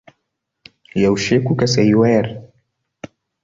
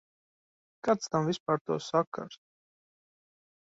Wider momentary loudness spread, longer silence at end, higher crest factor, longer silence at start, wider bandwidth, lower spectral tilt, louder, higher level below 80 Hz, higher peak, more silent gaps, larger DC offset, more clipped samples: first, 25 LU vs 10 LU; second, 0.4 s vs 1.45 s; second, 16 dB vs 22 dB; about the same, 0.95 s vs 0.85 s; about the same, 7.8 kHz vs 8 kHz; about the same, -6 dB/octave vs -5.5 dB/octave; first, -16 LUFS vs -31 LUFS; first, -48 dBFS vs -74 dBFS; first, -2 dBFS vs -12 dBFS; second, none vs 1.40-1.46 s, 1.61-1.65 s, 2.07-2.12 s; neither; neither